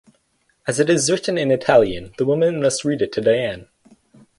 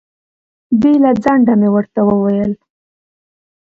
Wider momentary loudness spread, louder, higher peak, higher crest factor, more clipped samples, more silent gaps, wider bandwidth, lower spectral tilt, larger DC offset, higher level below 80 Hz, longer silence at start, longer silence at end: about the same, 9 LU vs 7 LU; second, -19 LUFS vs -13 LUFS; about the same, -2 dBFS vs 0 dBFS; about the same, 18 dB vs 14 dB; neither; neither; first, 11.5 kHz vs 6.8 kHz; second, -4.5 dB/octave vs -9.5 dB/octave; neither; about the same, -52 dBFS vs -50 dBFS; about the same, 0.65 s vs 0.7 s; second, 0.75 s vs 1.15 s